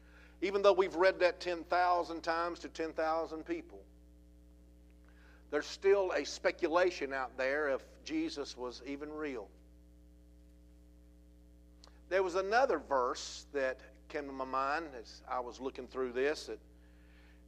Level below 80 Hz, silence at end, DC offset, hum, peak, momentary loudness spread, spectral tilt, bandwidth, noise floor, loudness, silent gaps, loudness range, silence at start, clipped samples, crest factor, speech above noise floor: -60 dBFS; 0.9 s; under 0.1%; 60 Hz at -60 dBFS; -14 dBFS; 13 LU; -4 dB/octave; 10.5 kHz; -59 dBFS; -35 LUFS; none; 10 LU; 0.15 s; under 0.1%; 22 dB; 25 dB